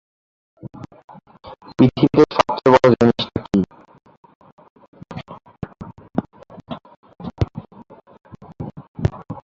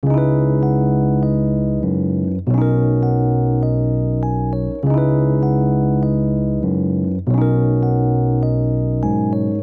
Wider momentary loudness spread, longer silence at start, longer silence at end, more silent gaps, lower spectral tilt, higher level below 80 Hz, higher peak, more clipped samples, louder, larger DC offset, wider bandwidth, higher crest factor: first, 25 LU vs 4 LU; first, 0.65 s vs 0.05 s; about the same, 0.05 s vs 0 s; first, 1.04-1.08 s, 4.17-4.23 s, 4.35-4.41 s, 4.52-4.57 s, 4.70-4.76 s, 4.88-4.93 s, 6.97-7.03 s, 8.88-8.95 s vs none; second, -7.5 dB/octave vs -13 dB/octave; second, -42 dBFS vs -34 dBFS; first, 0 dBFS vs -6 dBFS; neither; about the same, -18 LUFS vs -18 LUFS; neither; first, 7.6 kHz vs 2.4 kHz; first, 20 dB vs 12 dB